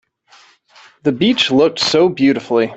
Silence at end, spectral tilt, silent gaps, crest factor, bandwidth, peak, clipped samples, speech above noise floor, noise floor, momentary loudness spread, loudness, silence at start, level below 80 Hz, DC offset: 0 s; -4.5 dB/octave; none; 14 dB; 8.2 kHz; -2 dBFS; under 0.1%; 35 dB; -49 dBFS; 6 LU; -14 LUFS; 1.05 s; -54 dBFS; under 0.1%